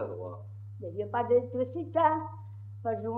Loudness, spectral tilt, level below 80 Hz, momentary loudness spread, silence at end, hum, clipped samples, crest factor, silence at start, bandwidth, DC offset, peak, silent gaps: -30 LUFS; -10 dB/octave; -74 dBFS; 18 LU; 0 s; none; under 0.1%; 18 dB; 0 s; 3.6 kHz; under 0.1%; -12 dBFS; none